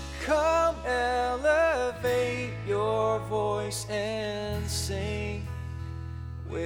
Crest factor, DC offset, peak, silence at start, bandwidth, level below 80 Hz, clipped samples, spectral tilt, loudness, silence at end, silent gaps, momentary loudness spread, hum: 16 dB; under 0.1%; -12 dBFS; 0 s; 19 kHz; -44 dBFS; under 0.1%; -4.5 dB/octave; -28 LUFS; 0 s; none; 13 LU; none